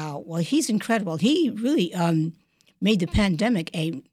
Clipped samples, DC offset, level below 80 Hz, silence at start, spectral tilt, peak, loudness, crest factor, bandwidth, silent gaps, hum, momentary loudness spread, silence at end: under 0.1%; under 0.1%; -42 dBFS; 0 s; -5.5 dB/octave; -8 dBFS; -24 LUFS; 14 dB; 14.5 kHz; none; none; 7 LU; 0.1 s